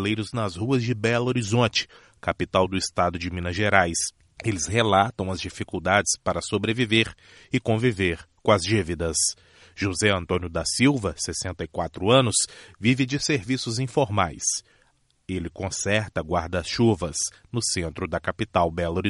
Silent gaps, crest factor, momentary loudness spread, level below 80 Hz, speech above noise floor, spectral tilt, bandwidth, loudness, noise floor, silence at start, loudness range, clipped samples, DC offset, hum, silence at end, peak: none; 22 dB; 9 LU; -48 dBFS; 40 dB; -4 dB/octave; 11.5 kHz; -24 LUFS; -64 dBFS; 0 s; 3 LU; under 0.1%; under 0.1%; none; 0 s; -2 dBFS